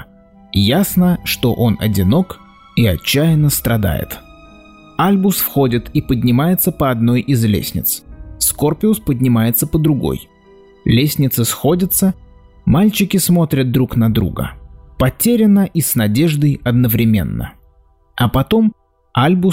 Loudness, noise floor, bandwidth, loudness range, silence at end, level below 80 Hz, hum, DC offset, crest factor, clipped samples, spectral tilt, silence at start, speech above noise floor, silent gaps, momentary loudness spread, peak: -15 LUFS; -51 dBFS; 16.5 kHz; 2 LU; 0 s; -36 dBFS; none; under 0.1%; 12 dB; under 0.1%; -5.5 dB/octave; 0 s; 37 dB; none; 9 LU; -4 dBFS